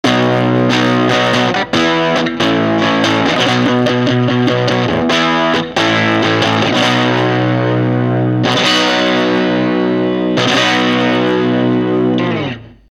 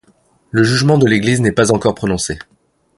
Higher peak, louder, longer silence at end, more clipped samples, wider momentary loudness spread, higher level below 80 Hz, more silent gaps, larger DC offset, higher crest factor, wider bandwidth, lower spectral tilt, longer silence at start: about the same, 0 dBFS vs 0 dBFS; about the same, -13 LUFS vs -14 LUFS; second, 0.25 s vs 0.6 s; neither; second, 3 LU vs 9 LU; about the same, -46 dBFS vs -42 dBFS; neither; neither; about the same, 12 dB vs 14 dB; about the same, 12 kHz vs 11.5 kHz; about the same, -5.5 dB/octave vs -5.5 dB/octave; second, 0.05 s vs 0.55 s